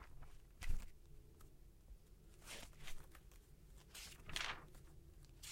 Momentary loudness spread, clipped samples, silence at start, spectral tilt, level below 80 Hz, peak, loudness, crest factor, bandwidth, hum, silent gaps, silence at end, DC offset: 19 LU; under 0.1%; 0 s; -2 dB/octave; -54 dBFS; -22 dBFS; -53 LUFS; 26 dB; 16.5 kHz; none; none; 0 s; under 0.1%